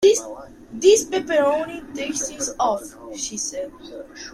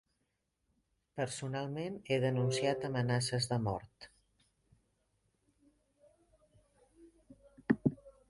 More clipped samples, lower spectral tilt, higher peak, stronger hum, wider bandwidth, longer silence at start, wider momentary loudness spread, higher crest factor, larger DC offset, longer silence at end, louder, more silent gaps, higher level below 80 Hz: neither; second, -2 dB/octave vs -5.5 dB/octave; first, -2 dBFS vs -14 dBFS; neither; first, 14 kHz vs 11.5 kHz; second, 0 s vs 1.15 s; first, 21 LU vs 16 LU; about the same, 20 dB vs 24 dB; neither; second, 0 s vs 0.2 s; first, -22 LUFS vs -35 LUFS; neither; first, -54 dBFS vs -66 dBFS